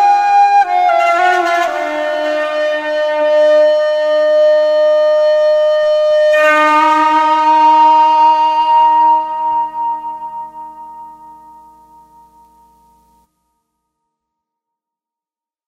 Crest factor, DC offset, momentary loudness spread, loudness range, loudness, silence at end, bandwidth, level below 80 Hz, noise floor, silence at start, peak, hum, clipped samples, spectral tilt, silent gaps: 12 dB; under 0.1%; 11 LU; 11 LU; -11 LUFS; 4.35 s; 9.6 kHz; -58 dBFS; -90 dBFS; 0 s; -2 dBFS; none; under 0.1%; -2 dB/octave; none